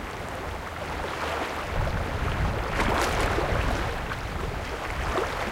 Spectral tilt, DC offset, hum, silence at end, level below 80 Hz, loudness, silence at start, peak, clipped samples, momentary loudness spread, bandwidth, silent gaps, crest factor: -5 dB/octave; under 0.1%; none; 0 s; -34 dBFS; -29 LUFS; 0 s; -12 dBFS; under 0.1%; 9 LU; 16.5 kHz; none; 16 dB